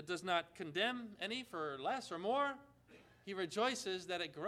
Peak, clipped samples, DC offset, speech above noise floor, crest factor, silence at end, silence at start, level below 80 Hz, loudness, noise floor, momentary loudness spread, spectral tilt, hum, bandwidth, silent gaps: -22 dBFS; under 0.1%; under 0.1%; 24 dB; 20 dB; 0 s; 0 s; -80 dBFS; -40 LUFS; -65 dBFS; 7 LU; -3.5 dB/octave; 60 Hz at -75 dBFS; 15 kHz; none